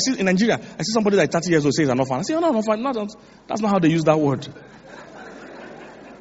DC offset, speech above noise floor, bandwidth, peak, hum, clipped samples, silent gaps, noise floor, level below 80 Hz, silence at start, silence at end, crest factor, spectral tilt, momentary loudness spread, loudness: under 0.1%; 20 dB; 8 kHz; -4 dBFS; none; under 0.1%; none; -40 dBFS; -58 dBFS; 0 s; 0.05 s; 18 dB; -5 dB/octave; 21 LU; -20 LUFS